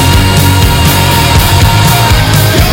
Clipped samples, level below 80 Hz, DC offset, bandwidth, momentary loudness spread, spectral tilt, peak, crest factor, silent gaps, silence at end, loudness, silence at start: 1%; -16 dBFS; under 0.1%; 17 kHz; 1 LU; -4.5 dB/octave; 0 dBFS; 6 dB; none; 0 s; -6 LUFS; 0 s